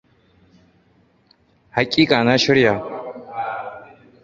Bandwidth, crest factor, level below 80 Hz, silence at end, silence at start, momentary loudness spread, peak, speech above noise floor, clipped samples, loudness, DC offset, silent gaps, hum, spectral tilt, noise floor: 7.8 kHz; 22 dB; -56 dBFS; 0.4 s; 1.75 s; 17 LU; 0 dBFS; 42 dB; under 0.1%; -18 LUFS; under 0.1%; none; none; -5 dB/octave; -58 dBFS